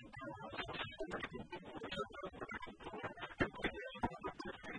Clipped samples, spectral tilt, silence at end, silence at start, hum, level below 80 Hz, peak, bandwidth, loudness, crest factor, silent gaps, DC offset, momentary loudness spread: under 0.1%; -5.5 dB/octave; 0 s; 0 s; none; -62 dBFS; -20 dBFS; 10 kHz; -46 LUFS; 26 dB; none; under 0.1%; 8 LU